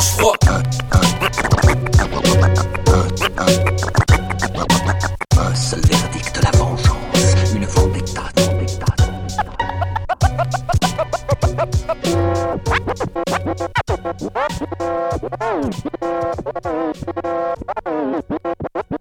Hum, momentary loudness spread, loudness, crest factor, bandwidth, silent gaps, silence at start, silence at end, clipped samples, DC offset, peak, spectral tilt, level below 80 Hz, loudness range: none; 9 LU; -18 LUFS; 16 dB; 17 kHz; none; 0 s; 0.05 s; under 0.1%; under 0.1%; 0 dBFS; -5 dB/octave; -26 dBFS; 7 LU